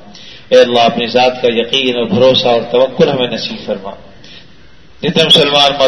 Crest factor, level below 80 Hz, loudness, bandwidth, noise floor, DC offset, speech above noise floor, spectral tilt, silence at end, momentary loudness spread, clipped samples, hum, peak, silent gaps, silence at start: 12 dB; -48 dBFS; -11 LUFS; 12 kHz; -43 dBFS; 1%; 32 dB; -4.5 dB/octave; 0 s; 13 LU; 0.3%; none; 0 dBFS; none; 0.15 s